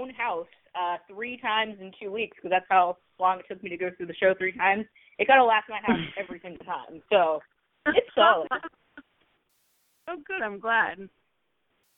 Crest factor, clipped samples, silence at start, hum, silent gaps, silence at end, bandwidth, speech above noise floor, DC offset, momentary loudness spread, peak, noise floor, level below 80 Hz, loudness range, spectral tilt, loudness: 22 dB; under 0.1%; 0 s; none; none; 0.9 s; 4 kHz; 50 dB; under 0.1%; 17 LU; -6 dBFS; -76 dBFS; -66 dBFS; 4 LU; -7 dB/octave; -26 LUFS